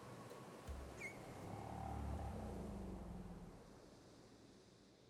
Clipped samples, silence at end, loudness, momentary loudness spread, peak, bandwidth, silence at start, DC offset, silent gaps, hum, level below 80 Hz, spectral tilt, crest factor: under 0.1%; 0 s; -52 LUFS; 15 LU; -36 dBFS; 16 kHz; 0 s; under 0.1%; none; none; -58 dBFS; -6.5 dB/octave; 16 dB